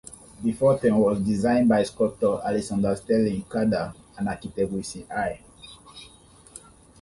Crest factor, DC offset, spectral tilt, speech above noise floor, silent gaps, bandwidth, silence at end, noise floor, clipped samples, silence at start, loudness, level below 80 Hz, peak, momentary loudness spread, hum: 16 dB; under 0.1%; -6.5 dB/octave; 28 dB; none; 11.5 kHz; 0.45 s; -51 dBFS; under 0.1%; 0.1 s; -24 LUFS; -52 dBFS; -10 dBFS; 24 LU; none